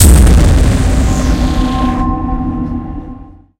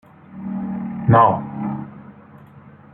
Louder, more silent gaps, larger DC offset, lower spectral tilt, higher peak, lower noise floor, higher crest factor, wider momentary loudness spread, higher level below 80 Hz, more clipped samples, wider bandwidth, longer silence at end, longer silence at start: first, -12 LUFS vs -19 LUFS; neither; neither; second, -5.5 dB/octave vs -11.5 dB/octave; about the same, 0 dBFS vs -2 dBFS; second, -31 dBFS vs -44 dBFS; second, 10 dB vs 20 dB; second, 15 LU vs 18 LU; first, -12 dBFS vs -54 dBFS; first, 0.2% vs under 0.1%; first, 17 kHz vs 3.7 kHz; about the same, 0.3 s vs 0.25 s; second, 0 s vs 0.3 s